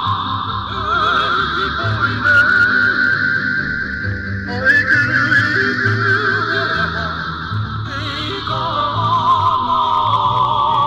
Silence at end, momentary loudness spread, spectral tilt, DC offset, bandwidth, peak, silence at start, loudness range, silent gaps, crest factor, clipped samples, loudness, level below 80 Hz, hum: 0 s; 10 LU; -5.5 dB/octave; under 0.1%; 9.2 kHz; -4 dBFS; 0 s; 4 LU; none; 14 dB; under 0.1%; -15 LUFS; -38 dBFS; none